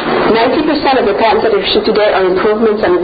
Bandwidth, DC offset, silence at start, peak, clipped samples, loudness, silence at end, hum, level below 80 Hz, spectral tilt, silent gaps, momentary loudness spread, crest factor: 5 kHz; under 0.1%; 0 s; 0 dBFS; under 0.1%; -11 LUFS; 0 s; none; -40 dBFS; -8 dB/octave; none; 1 LU; 10 dB